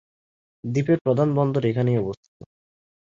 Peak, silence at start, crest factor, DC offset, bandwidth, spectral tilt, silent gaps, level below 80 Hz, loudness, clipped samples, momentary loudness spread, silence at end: -6 dBFS; 0.65 s; 18 dB; under 0.1%; 7.2 kHz; -9 dB/octave; 1.01-1.05 s; -58 dBFS; -22 LUFS; under 0.1%; 12 LU; 0.9 s